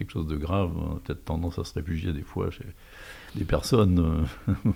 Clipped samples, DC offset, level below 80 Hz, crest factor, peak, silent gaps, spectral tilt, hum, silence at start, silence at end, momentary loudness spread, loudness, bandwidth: under 0.1%; under 0.1%; -40 dBFS; 18 dB; -8 dBFS; none; -7 dB/octave; none; 0 s; 0 s; 19 LU; -28 LUFS; 16 kHz